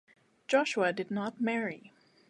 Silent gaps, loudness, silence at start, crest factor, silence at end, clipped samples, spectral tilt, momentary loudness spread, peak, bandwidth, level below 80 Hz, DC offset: none; -31 LUFS; 0.5 s; 20 dB; 0.4 s; under 0.1%; -4.5 dB/octave; 14 LU; -12 dBFS; 11.5 kHz; -82 dBFS; under 0.1%